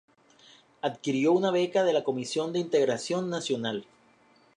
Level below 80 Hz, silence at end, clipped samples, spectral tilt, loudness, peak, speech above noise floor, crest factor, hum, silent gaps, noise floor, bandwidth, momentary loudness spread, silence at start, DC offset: -78 dBFS; 0.75 s; under 0.1%; -5 dB/octave; -28 LUFS; -12 dBFS; 35 dB; 16 dB; none; none; -62 dBFS; 11 kHz; 9 LU; 0.85 s; under 0.1%